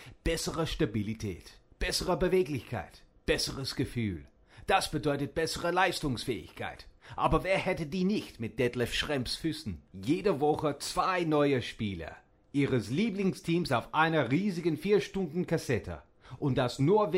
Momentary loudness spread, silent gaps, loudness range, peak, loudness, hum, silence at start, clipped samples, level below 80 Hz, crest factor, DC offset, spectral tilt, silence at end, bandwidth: 13 LU; none; 3 LU; -10 dBFS; -31 LUFS; none; 0 s; under 0.1%; -48 dBFS; 20 dB; under 0.1%; -5.5 dB/octave; 0 s; 16 kHz